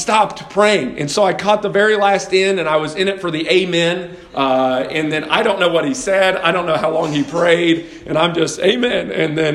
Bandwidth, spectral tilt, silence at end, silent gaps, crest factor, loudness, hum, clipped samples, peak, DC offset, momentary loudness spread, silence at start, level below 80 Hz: 12.5 kHz; -4 dB/octave; 0 s; none; 16 dB; -16 LUFS; none; under 0.1%; 0 dBFS; under 0.1%; 5 LU; 0 s; -52 dBFS